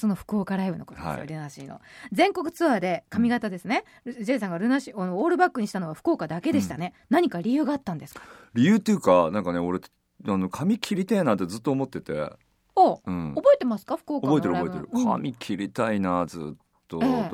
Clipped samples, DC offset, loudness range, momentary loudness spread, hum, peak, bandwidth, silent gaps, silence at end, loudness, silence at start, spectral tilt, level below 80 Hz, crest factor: under 0.1%; under 0.1%; 3 LU; 14 LU; none; -6 dBFS; 16 kHz; none; 0 s; -25 LUFS; 0 s; -6.5 dB/octave; -60 dBFS; 20 dB